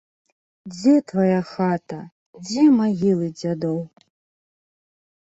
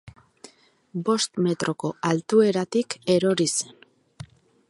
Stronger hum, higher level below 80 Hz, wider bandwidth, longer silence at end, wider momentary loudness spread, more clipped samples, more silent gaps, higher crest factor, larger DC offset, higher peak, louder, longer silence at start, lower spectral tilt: neither; about the same, -64 dBFS vs -64 dBFS; second, 8 kHz vs 11.5 kHz; first, 1.35 s vs 0.45 s; first, 19 LU vs 8 LU; neither; first, 2.12-2.33 s vs none; about the same, 16 dB vs 18 dB; neither; about the same, -6 dBFS vs -8 dBFS; first, -20 LUFS vs -23 LUFS; first, 0.65 s vs 0.05 s; first, -7 dB/octave vs -4.5 dB/octave